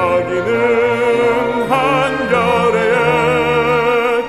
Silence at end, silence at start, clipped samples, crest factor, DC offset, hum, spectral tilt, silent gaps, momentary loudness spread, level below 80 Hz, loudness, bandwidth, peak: 0 s; 0 s; under 0.1%; 12 dB; under 0.1%; none; -5.5 dB/octave; none; 2 LU; -42 dBFS; -14 LUFS; 13 kHz; -2 dBFS